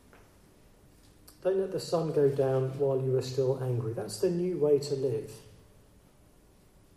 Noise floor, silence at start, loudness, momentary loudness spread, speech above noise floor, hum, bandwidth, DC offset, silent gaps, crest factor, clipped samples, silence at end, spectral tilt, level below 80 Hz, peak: -60 dBFS; 1.45 s; -30 LUFS; 8 LU; 31 dB; none; 13.5 kHz; under 0.1%; none; 16 dB; under 0.1%; 1.55 s; -7 dB/octave; -64 dBFS; -16 dBFS